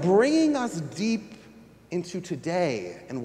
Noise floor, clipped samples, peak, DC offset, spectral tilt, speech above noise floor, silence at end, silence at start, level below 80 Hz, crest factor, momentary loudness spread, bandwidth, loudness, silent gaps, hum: -51 dBFS; under 0.1%; -8 dBFS; under 0.1%; -5.5 dB/octave; 25 dB; 0 s; 0 s; -66 dBFS; 18 dB; 13 LU; 12 kHz; -27 LUFS; none; none